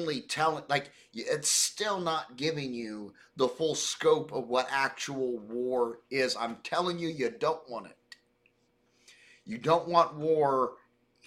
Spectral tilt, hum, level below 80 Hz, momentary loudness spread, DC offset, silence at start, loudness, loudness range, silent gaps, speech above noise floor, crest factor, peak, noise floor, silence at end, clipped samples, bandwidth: -3 dB/octave; none; -72 dBFS; 12 LU; under 0.1%; 0 s; -30 LUFS; 4 LU; none; 40 dB; 22 dB; -8 dBFS; -71 dBFS; 0.5 s; under 0.1%; 16 kHz